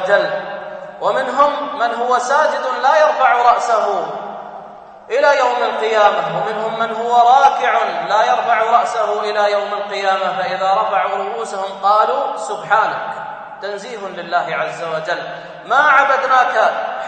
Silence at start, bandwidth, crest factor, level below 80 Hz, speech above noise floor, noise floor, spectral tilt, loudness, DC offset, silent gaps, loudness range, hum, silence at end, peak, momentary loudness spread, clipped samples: 0 s; 8.8 kHz; 16 dB; -64 dBFS; 21 dB; -36 dBFS; -3 dB/octave; -15 LUFS; under 0.1%; none; 4 LU; none; 0 s; 0 dBFS; 14 LU; under 0.1%